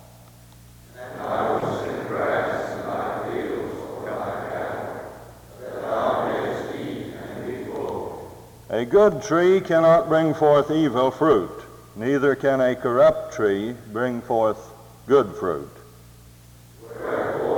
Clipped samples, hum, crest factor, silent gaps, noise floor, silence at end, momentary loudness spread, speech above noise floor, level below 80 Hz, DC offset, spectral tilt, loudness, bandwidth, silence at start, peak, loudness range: under 0.1%; none; 18 dB; none; -48 dBFS; 0 s; 17 LU; 28 dB; -54 dBFS; under 0.1%; -6.5 dB/octave; -22 LUFS; over 20 kHz; 0.95 s; -6 dBFS; 9 LU